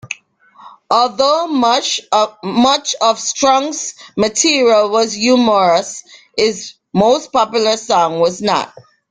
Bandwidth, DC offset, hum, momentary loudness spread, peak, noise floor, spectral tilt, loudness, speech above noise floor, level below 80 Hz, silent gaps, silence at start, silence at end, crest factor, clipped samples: 9.8 kHz; under 0.1%; none; 11 LU; 0 dBFS; -46 dBFS; -3 dB/octave; -14 LUFS; 32 dB; -56 dBFS; none; 0.05 s; 0.45 s; 14 dB; under 0.1%